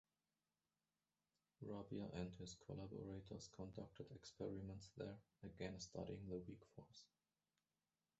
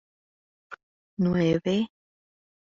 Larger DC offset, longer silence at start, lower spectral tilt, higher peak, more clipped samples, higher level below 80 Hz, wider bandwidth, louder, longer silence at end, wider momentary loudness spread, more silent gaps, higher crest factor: neither; first, 1.6 s vs 0.7 s; about the same, -6.5 dB/octave vs -6.5 dB/octave; second, -34 dBFS vs -12 dBFS; neither; second, -72 dBFS vs -58 dBFS; first, 8 kHz vs 7.2 kHz; second, -55 LUFS vs -26 LUFS; first, 1.15 s vs 0.9 s; second, 9 LU vs 23 LU; second, none vs 0.83-1.17 s; about the same, 22 dB vs 18 dB